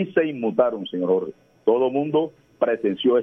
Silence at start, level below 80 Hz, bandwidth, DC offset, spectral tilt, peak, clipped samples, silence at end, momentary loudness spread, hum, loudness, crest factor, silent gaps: 0 s; -70 dBFS; 3.7 kHz; under 0.1%; -8.5 dB/octave; -6 dBFS; under 0.1%; 0 s; 6 LU; none; -23 LUFS; 16 dB; none